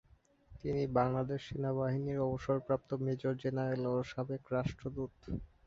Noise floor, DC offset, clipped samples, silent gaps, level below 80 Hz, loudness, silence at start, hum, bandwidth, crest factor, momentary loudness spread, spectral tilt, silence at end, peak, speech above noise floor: -63 dBFS; under 0.1%; under 0.1%; none; -56 dBFS; -36 LUFS; 0.5 s; none; 7.4 kHz; 18 dB; 9 LU; -7.5 dB/octave; 0.2 s; -18 dBFS; 27 dB